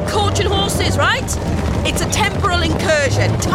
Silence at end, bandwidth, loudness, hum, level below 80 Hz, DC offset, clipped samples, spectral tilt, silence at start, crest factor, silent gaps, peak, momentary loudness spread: 0 s; 16 kHz; -16 LUFS; none; -26 dBFS; under 0.1%; under 0.1%; -4.5 dB/octave; 0 s; 12 dB; none; -4 dBFS; 3 LU